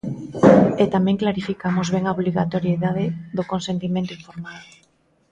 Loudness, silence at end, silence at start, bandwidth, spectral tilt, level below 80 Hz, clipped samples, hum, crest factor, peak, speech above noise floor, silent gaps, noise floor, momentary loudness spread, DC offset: -20 LUFS; 0.7 s; 0.05 s; 7.8 kHz; -7.5 dB/octave; -52 dBFS; under 0.1%; none; 20 dB; 0 dBFS; 39 dB; none; -61 dBFS; 16 LU; under 0.1%